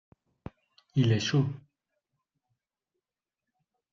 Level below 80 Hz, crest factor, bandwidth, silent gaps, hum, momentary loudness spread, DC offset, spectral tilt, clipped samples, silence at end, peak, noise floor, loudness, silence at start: -64 dBFS; 20 dB; 7.4 kHz; none; none; 23 LU; under 0.1%; -6 dB/octave; under 0.1%; 2.35 s; -14 dBFS; -90 dBFS; -28 LUFS; 0.95 s